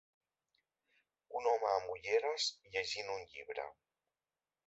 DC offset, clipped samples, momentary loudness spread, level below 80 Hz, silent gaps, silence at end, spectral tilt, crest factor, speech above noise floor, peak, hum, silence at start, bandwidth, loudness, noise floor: under 0.1%; under 0.1%; 12 LU; -78 dBFS; none; 0.95 s; 1.5 dB/octave; 20 dB; over 52 dB; -20 dBFS; none; 1.3 s; 8 kHz; -38 LUFS; under -90 dBFS